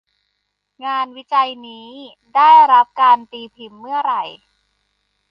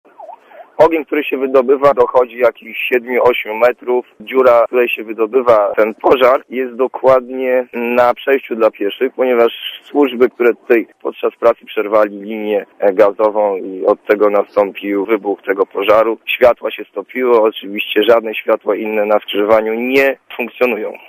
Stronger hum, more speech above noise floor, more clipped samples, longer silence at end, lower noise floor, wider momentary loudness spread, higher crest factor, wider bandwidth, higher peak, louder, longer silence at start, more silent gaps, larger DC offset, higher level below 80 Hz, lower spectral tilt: first, 50 Hz at -70 dBFS vs none; first, 57 dB vs 23 dB; neither; first, 1 s vs 0.1 s; first, -73 dBFS vs -37 dBFS; first, 27 LU vs 7 LU; about the same, 16 dB vs 14 dB; second, 5.8 kHz vs 15.5 kHz; about the same, -2 dBFS vs 0 dBFS; about the same, -14 LUFS vs -14 LUFS; first, 0.8 s vs 0.2 s; neither; neither; second, -72 dBFS vs -54 dBFS; second, -3.5 dB/octave vs -6 dB/octave